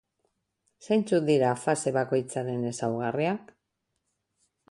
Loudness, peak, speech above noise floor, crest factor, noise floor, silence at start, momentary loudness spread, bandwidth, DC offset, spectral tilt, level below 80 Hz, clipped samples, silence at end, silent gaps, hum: -27 LUFS; -12 dBFS; 54 dB; 18 dB; -81 dBFS; 0.8 s; 7 LU; 11.5 kHz; under 0.1%; -6 dB/octave; -70 dBFS; under 0.1%; 1.3 s; none; none